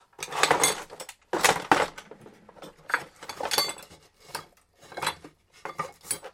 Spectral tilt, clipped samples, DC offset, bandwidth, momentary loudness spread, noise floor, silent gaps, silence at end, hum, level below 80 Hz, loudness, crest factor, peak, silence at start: -1 dB/octave; under 0.1%; under 0.1%; 16.5 kHz; 21 LU; -55 dBFS; none; 0.05 s; none; -64 dBFS; -27 LUFS; 28 dB; -2 dBFS; 0.2 s